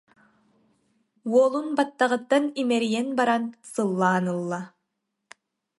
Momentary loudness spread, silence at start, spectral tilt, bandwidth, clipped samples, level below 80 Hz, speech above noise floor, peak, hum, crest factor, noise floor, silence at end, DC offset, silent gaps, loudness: 11 LU; 1.25 s; -5.5 dB/octave; 11.5 kHz; under 0.1%; -78 dBFS; 56 dB; -8 dBFS; none; 18 dB; -80 dBFS; 1.1 s; under 0.1%; none; -24 LUFS